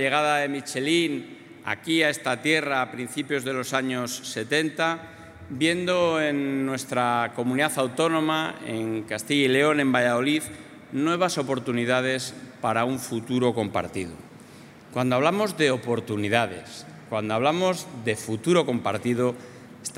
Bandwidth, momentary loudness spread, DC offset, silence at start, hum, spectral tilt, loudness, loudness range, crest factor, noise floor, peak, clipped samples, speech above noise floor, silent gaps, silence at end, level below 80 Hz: 16 kHz; 12 LU; under 0.1%; 0 s; none; -4.5 dB/octave; -25 LUFS; 3 LU; 22 dB; -47 dBFS; -4 dBFS; under 0.1%; 22 dB; none; 0 s; -68 dBFS